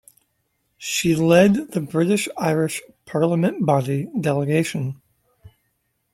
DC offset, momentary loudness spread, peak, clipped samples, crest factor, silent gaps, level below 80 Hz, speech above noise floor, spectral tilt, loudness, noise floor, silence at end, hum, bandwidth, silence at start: under 0.1%; 13 LU; -2 dBFS; under 0.1%; 20 dB; none; -58 dBFS; 51 dB; -5.5 dB/octave; -20 LUFS; -71 dBFS; 0.65 s; none; 16 kHz; 0.8 s